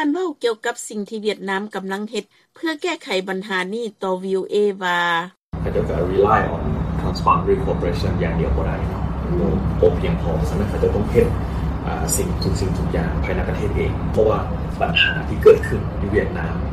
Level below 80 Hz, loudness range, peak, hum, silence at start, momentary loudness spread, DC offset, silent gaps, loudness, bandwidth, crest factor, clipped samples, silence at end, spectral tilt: -28 dBFS; 6 LU; -2 dBFS; none; 0 s; 9 LU; under 0.1%; 5.41-5.50 s; -20 LUFS; 15 kHz; 18 dB; under 0.1%; 0 s; -5.5 dB/octave